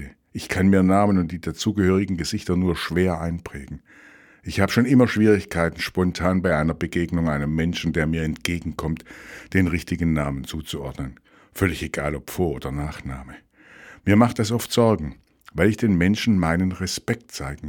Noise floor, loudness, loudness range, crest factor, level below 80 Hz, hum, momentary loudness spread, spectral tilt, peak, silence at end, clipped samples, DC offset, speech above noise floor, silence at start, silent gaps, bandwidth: -47 dBFS; -22 LUFS; 6 LU; 22 dB; -40 dBFS; none; 16 LU; -6 dB/octave; 0 dBFS; 0 s; under 0.1%; under 0.1%; 25 dB; 0 s; none; 18.5 kHz